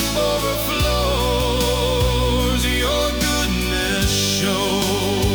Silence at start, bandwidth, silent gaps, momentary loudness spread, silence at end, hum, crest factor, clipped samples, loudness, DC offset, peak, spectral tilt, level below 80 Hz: 0 s; over 20 kHz; none; 2 LU; 0 s; none; 12 dB; under 0.1%; -19 LUFS; under 0.1%; -8 dBFS; -4 dB/octave; -26 dBFS